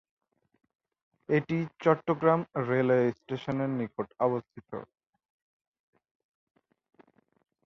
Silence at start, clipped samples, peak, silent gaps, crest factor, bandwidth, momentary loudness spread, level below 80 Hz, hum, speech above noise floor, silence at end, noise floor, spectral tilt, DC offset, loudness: 1.3 s; under 0.1%; -8 dBFS; none; 22 dB; 6.6 kHz; 13 LU; -70 dBFS; none; 35 dB; 2.8 s; -63 dBFS; -9 dB/octave; under 0.1%; -29 LUFS